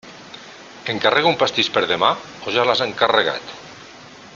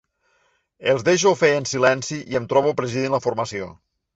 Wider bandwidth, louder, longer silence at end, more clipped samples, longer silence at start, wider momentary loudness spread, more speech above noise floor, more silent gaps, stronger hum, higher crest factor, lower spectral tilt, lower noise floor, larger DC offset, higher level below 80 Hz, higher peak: about the same, 7.6 kHz vs 8.2 kHz; about the same, -18 LUFS vs -20 LUFS; second, 0 s vs 0.45 s; neither; second, 0.05 s vs 0.8 s; first, 22 LU vs 10 LU; second, 22 dB vs 45 dB; neither; neither; about the same, 20 dB vs 18 dB; about the same, -3.5 dB/octave vs -4 dB/octave; second, -41 dBFS vs -65 dBFS; neither; about the same, -60 dBFS vs -58 dBFS; first, 0 dBFS vs -4 dBFS